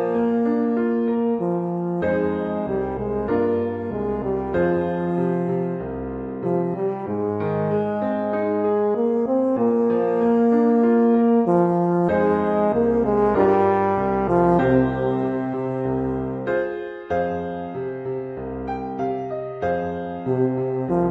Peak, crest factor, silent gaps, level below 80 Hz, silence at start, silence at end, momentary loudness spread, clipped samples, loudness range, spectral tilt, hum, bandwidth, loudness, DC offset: -6 dBFS; 16 dB; none; -46 dBFS; 0 s; 0 s; 11 LU; under 0.1%; 8 LU; -10 dB/octave; none; 4.9 kHz; -22 LUFS; under 0.1%